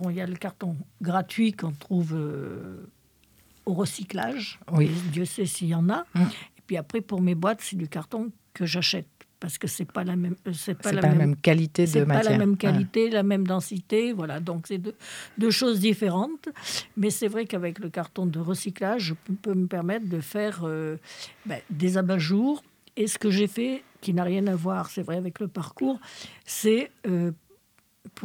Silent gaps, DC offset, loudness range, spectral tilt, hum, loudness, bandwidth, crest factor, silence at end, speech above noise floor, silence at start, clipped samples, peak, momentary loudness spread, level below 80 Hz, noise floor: none; under 0.1%; 6 LU; -5.5 dB/octave; none; -27 LUFS; 18 kHz; 22 dB; 0 s; 39 dB; 0 s; under 0.1%; -6 dBFS; 12 LU; -70 dBFS; -65 dBFS